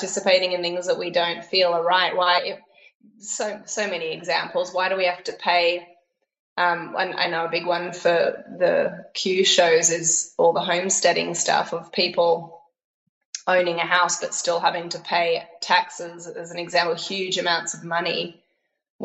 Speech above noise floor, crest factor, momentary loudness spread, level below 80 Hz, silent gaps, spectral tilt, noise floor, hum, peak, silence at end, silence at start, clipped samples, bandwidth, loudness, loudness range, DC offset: 50 dB; 20 dB; 9 LU; -76 dBFS; 2.95-3.00 s, 6.39-6.56 s, 12.84-13.33 s, 18.90-18.99 s; -1.5 dB/octave; -72 dBFS; none; -4 dBFS; 0 s; 0 s; under 0.1%; 8.8 kHz; -22 LUFS; 5 LU; under 0.1%